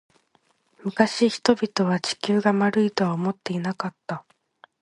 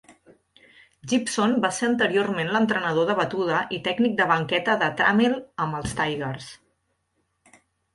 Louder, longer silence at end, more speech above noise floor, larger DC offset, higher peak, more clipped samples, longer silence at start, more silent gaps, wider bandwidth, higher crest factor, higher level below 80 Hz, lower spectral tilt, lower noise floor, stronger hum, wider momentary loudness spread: about the same, -23 LUFS vs -23 LUFS; second, 0.6 s vs 1.4 s; second, 43 dB vs 50 dB; neither; first, -2 dBFS vs -6 dBFS; neither; first, 0.85 s vs 0.1 s; neither; about the same, 11.5 kHz vs 11.5 kHz; about the same, 22 dB vs 20 dB; second, -66 dBFS vs -56 dBFS; about the same, -5.5 dB/octave vs -4.5 dB/octave; second, -66 dBFS vs -73 dBFS; neither; first, 12 LU vs 8 LU